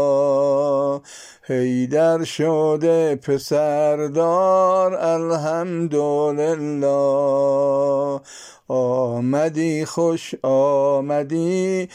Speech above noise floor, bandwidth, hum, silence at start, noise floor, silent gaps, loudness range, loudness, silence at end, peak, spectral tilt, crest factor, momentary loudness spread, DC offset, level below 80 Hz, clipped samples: 22 dB; 14.5 kHz; none; 0 s; -41 dBFS; none; 2 LU; -19 LUFS; 0 s; -8 dBFS; -6.5 dB/octave; 12 dB; 6 LU; under 0.1%; -68 dBFS; under 0.1%